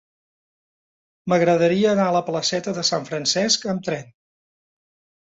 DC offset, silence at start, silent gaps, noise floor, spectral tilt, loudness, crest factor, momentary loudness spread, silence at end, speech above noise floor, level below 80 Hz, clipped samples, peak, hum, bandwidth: under 0.1%; 1.25 s; none; under -90 dBFS; -4 dB/octave; -20 LUFS; 18 dB; 9 LU; 1.25 s; over 70 dB; -64 dBFS; under 0.1%; -6 dBFS; none; 8 kHz